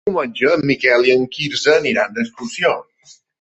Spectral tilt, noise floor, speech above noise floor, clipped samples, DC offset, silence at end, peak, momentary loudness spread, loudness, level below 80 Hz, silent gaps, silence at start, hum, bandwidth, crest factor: -4 dB/octave; -50 dBFS; 33 dB; under 0.1%; under 0.1%; 0.6 s; -2 dBFS; 9 LU; -16 LUFS; -58 dBFS; none; 0.05 s; none; 8.4 kHz; 16 dB